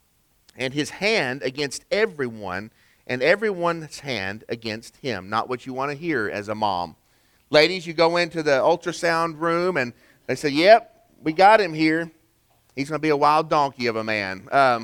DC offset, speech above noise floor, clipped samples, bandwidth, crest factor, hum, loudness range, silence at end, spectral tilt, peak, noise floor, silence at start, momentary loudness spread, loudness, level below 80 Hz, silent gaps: under 0.1%; 41 dB; under 0.1%; 18 kHz; 20 dB; none; 7 LU; 0 s; -4.5 dB/octave; -2 dBFS; -62 dBFS; 0.6 s; 13 LU; -22 LUFS; -60 dBFS; none